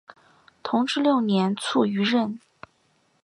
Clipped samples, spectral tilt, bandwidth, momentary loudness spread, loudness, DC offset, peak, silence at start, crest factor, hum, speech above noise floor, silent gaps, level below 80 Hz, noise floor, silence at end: under 0.1%; -5.5 dB/octave; 11 kHz; 10 LU; -23 LUFS; under 0.1%; -8 dBFS; 0.65 s; 18 dB; none; 44 dB; none; -72 dBFS; -66 dBFS; 0.85 s